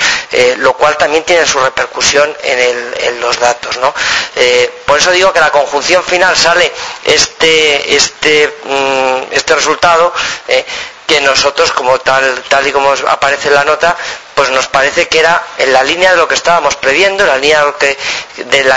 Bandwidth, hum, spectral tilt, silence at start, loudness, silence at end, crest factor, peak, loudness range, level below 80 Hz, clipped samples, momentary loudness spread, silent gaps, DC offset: 11 kHz; none; -1 dB/octave; 0 s; -9 LUFS; 0 s; 10 dB; 0 dBFS; 2 LU; -42 dBFS; 0.9%; 5 LU; none; under 0.1%